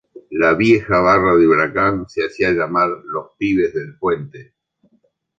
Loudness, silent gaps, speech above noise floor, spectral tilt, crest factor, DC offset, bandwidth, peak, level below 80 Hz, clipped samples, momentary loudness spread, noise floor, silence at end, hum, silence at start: -16 LUFS; none; 45 dB; -7 dB/octave; 16 dB; under 0.1%; 7.8 kHz; -2 dBFS; -46 dBFS; under 0.1%; 12 LU; -62 dBFS; 0.95 s; none; 0.3 s